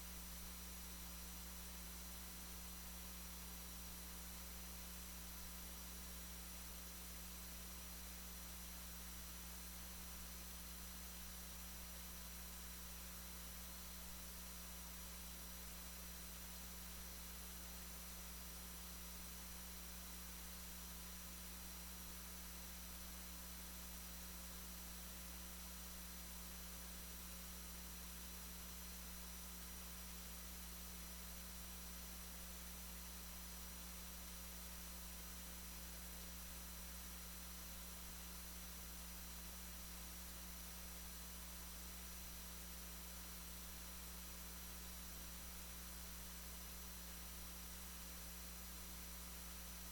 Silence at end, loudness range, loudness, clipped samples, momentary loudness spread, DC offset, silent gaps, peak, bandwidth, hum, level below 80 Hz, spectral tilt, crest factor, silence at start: 0 s; 0 LU; -51 LUFS; under 0.1%; 0 LU; under 0.1%; none; -38 dBFS; 19 kHz; none; -58 dBFS; -2.5 dB/octave; 14 dB; 0 s